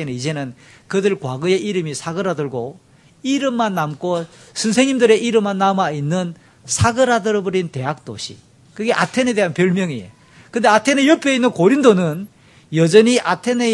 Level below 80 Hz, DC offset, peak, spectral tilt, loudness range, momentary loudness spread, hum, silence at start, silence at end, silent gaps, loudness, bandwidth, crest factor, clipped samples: -56 dBFS; under 0.1%; 0 dBFS; -5 dB/octave; 6 LU; 14 LU; none; 0 s; 0 s; none; -17 LUFS; 12 kHz; 18 dB; under 0.1%